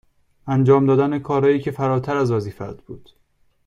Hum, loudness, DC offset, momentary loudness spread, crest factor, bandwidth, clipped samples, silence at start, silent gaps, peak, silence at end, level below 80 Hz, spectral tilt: none; -19 LUFS; under 0.1%; 19 LU; 18 dB; 7.4 kHz; under 0.1%; 0.45 s; none; -2 dBFS; 0.7 s; -54 dBFS; -9 dB/octave